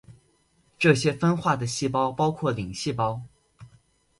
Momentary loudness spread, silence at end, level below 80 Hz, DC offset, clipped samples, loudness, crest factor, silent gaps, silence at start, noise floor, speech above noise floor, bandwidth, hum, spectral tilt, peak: 8 LU; 0.55 s; -56 dBFS; under 0.1%; under 0.1%; -25 LUFS; 22 dB; none; 0.1 s; -65 dBFS; 41 dB; 11.5 kHz; none; -5.5 dB/octave; -4 dBFS